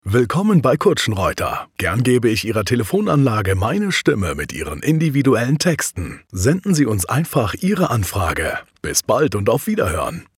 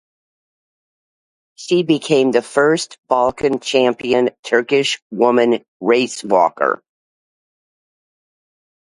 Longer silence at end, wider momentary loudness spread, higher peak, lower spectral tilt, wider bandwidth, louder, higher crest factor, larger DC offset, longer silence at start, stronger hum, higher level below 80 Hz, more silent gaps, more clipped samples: second, 0.15 s vs 2.05 s; about the same, 7 LU vs 5 LU; second, -4 dBFS vs 0 dBFS; about the same, -5.5 dB/octave vs -4.5 dB/octave; first, 17 kHz vs 11.5 kHz; about the same, -18 LUFS vs -16 LUFS; about the same, 14 dB vs 18 dB; neither; second, 0.05 s vs 1.6 s; neither; first, -44 dBFS vs -60 dBFS; second, none vs 2.98-3.03 s, 4.39-4.43 s, 5.02-5.10 s, 5.68-5.80 s; neither